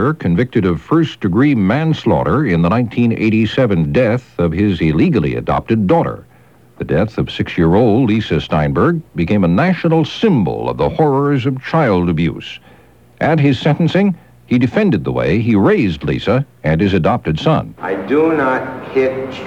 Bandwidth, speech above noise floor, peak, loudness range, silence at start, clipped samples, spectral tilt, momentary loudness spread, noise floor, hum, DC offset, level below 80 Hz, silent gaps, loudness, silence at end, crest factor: 7.6 kHz; 32 dB; -2 dBFS; 2 LU; 0 s; under 0.1%; -8.5 dB/octave; 6 LU; -46 dBFS; none; 0.2%; -38 dBFS; none; -15 LUFS; 0 s; 14 dB